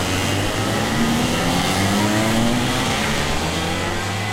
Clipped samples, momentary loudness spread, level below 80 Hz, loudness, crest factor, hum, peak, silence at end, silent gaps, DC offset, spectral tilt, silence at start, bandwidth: under 0.1%; 4 LU; -34 dBFS; -19 LUFS; 14 dB; none; -6 dBFS; 0 s; none; under 0.1%; -4 dB/octave; 0 s; 16 kHz